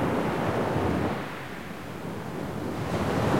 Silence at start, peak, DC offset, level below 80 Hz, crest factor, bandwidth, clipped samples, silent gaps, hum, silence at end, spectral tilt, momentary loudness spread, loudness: 0 s; -12 dBFS; 0.5%; -50 dBFS; 16 dB; 16.5 kHz; under 0.1%; none; none; 0 s; -6.5 dB/octave; 10 LU; -30 LUFS